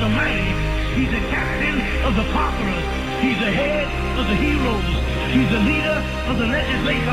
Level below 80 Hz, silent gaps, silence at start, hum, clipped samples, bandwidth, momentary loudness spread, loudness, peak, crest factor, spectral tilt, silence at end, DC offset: -26 dBFS; none; 0 s; none; under 0.1%; 14.5 kHz; 4 LU; -20 LUFS; -6 dBFS; 12 dB; -6 dB/octave; 0 s; under 0.1%